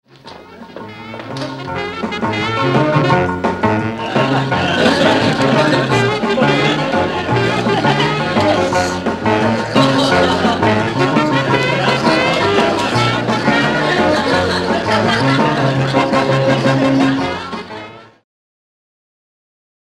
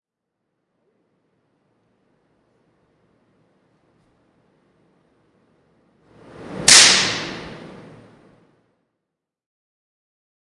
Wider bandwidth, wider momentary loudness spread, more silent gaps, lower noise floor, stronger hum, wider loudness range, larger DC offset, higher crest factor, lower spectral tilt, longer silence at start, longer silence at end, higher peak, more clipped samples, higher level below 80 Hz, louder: about the same, 12.5 kHz vs 12 kHz; second, 10 LU vs 29 LU; neither; second, -37 dBFS vs -82 dBFS; neither; second, 4 LU vs 10 LU; neither; second, 16 dB vs 24 dB; first, -5.5 dB/octave vs 0.5 dB/octave; second, 0.25 s vs 6.4 s; second, 1.9 s vs 2.9 s; about the same, 0 dBFS vs 0 dBFS; neither; first, -44 dBFS vs -56 dBFS; second, -14 LUFS vs -11 LUFS